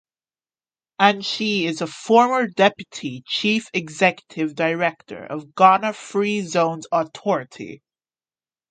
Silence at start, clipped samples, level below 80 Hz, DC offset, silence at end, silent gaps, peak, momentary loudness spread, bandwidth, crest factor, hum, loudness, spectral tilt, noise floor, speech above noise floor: 1 s; under 0.1%; -70 dBFS; under 0.1%; 0.95 s; none; 0 dBFS; 16 LU; 9.4 kHz; 22 dB; none; -20 LUFS; -4.5 dB/octave; under -90 dBFS; over 69 dB